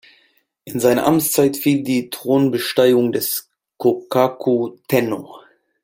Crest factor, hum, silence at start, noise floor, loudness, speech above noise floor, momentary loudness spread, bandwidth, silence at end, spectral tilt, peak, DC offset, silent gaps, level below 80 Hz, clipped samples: 16 dB; none; 0.65 s; -60 dBFS; -18 LUFS; 43 dB; 7 LU; 17 kHz; 0.45 s; -5 dB/octave; -2 dBFS; under 0.1%; none; -60 dBFS; under 0.1%